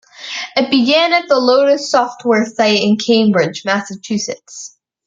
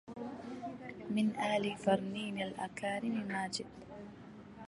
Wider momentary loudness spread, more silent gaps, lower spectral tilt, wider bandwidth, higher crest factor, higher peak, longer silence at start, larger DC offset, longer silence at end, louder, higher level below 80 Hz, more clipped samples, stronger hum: second, 13 LU vs 17 LU; neither; about the same, -4 dB/octave vs -5 dB/octave; second, 8.8 kHz vs 11.5 kHz; second, 14 dB vs 20 dB; first, 0 dBFS vs -18 dBFS; first, 0.2 s vs 0.05 s; neither; first, 0.4 s vs 0 s; first, -14 LUFS vs -37 LUFS; first, -64 dBFS vs -70 dBFS; neither; neither